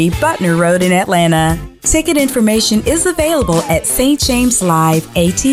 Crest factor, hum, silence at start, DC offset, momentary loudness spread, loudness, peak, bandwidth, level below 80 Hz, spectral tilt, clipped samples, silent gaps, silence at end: 10 dB; none; 0 s; under 0.1%; 3 LU; -12 LUFS; -2 dBFS; 16.5 kHz; -30 dBFS; -4 dB/octave; under 0.1%; none; 0 s